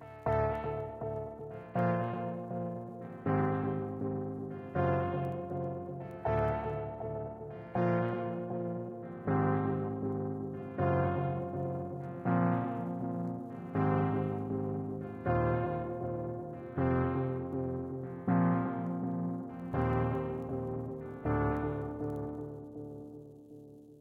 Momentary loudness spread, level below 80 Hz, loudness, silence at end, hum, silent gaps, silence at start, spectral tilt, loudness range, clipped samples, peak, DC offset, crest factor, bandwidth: 11 LU; -54 dBFS; -35 LUFS; 0 s; none; none; 0 s; -10.5 dB/octave; 2 LU; under 0.1%; -18 dBFS; under 0.1%; 18 dB; 4.7 kHz